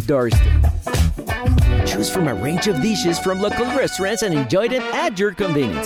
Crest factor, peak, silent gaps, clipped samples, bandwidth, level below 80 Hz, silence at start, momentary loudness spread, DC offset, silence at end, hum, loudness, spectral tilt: 12 dB; -6 dBFS; none; under 0.1%; 16.5 kHz; -24 dBFS; 0 s; 4 LU; under 0.1%; 0 s; none; -19 LUFS; -5.5 dB/octave